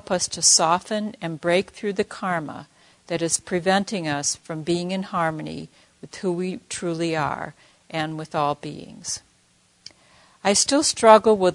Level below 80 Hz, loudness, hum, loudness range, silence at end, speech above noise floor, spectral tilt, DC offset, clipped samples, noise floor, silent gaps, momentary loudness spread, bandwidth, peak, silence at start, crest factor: -62 dBFS; -22 LUFS; none; 6 LU; 0 s; 38 dB; -3 dB/octave; under 0.1%; under 0.1%; -61 dBFS; none; 17 LU; 11 kHz; 0 dBFS; 0.1 s; 24 dB